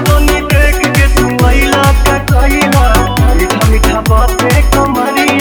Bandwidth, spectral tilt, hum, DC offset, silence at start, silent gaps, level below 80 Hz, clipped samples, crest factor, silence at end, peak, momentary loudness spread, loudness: over 20 kHz; -5 dB/octave; none; under 0.1%; 0 s; none; -12 dBFS; under 0.1%; 8 dB; 0 s; 0 dBFS; 2 LU; -9 LUFS